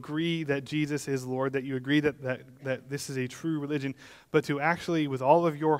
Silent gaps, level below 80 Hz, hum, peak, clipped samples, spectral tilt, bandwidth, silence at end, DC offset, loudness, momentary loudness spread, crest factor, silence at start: none; -68 dBFS; none; -8 dBFS; under 0.1%; -6 dB/octave; 16 kHz; 0 s; under 0.1%; -29 LUFS; 11 LU; 22 dB; 0 s